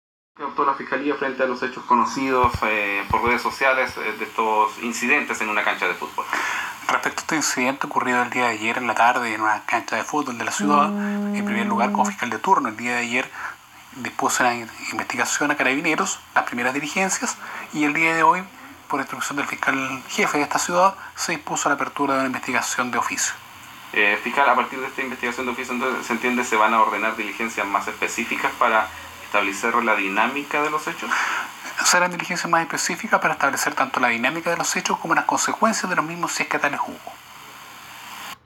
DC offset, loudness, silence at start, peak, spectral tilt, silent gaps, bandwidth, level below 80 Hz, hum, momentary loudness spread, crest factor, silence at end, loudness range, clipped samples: under 0.1%; -21 LUFS; 0.4 s; -4 dBFS; -2.5 dB/octave; none; 19 kHz; -54 dBFS; none; 9 LU; 18 dB; 0.1 s; 2 LU; under 0.1%